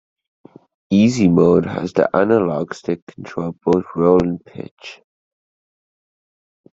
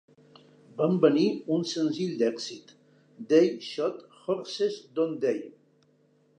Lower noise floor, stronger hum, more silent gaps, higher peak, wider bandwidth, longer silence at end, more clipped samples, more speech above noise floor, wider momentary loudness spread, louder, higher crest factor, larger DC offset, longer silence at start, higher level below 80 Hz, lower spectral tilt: first, under -90 dBFS vs -65 dBFS; neither; first, 3.02-3.07 s, 4.71-4.77 s vs none; first, 0 dBFS vs -6 dBFS; second, 7.8 kHz vs 9.6 kHz; first, 1.8 s vs 0.9 s; neither; first, over 73 dB vs 38 dB; first, 19 LU vs 16 LU; first, -17 LUFS vs -27 LUFS; about the same, 18 dB vs 22 dB; neither; first, 0.9 s vs 0.75 s; first, -52 dBFS vs -84 dBFS; first, -7.5 dB/octave vs -6 dB/octave